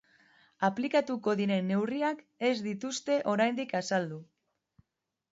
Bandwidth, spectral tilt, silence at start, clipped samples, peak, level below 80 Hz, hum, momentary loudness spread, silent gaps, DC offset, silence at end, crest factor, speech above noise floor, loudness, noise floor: 8 kHz; -5 dB/octave; 0.6 s; under 0.1%; -14 dBFS; -78 dBFS; none; 6 LU; none; under 0.1%; 1.1 s; 18 dB; 55 dB; -31 LUFS; -85 dBFS